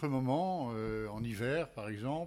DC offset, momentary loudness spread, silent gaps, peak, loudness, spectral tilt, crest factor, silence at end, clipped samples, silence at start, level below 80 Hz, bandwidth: under 0.1%; 7 LU; none; -20 dBFS; -36 LUFS; -7.5 dB/octave; 14 dB; 0 s; under 0.1%; 0 s; -58 dBFS; 15.5 kHz